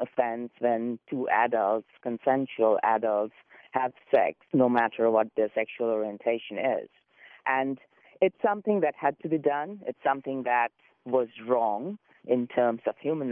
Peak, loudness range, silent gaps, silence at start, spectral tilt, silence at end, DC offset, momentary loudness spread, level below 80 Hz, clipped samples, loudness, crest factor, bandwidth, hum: -10 dBFS; 3 LU; none; 0 s; -9.5 dB/octave; 0 s; under 0.1%; 9 LU; -80 dBFS; under 0.1%; -28 LUFS; 18 dB; 4.1 kHz; none